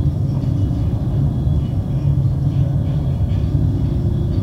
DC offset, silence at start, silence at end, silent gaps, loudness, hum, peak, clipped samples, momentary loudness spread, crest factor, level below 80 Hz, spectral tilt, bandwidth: under 0.1%; 0 s; 0 s; none; -19 LUFS; none; -6 dBFS; under 0.1%; 2 LU; 12 dB; -26 dBFS; -10 dB/octave; 6.2 kHz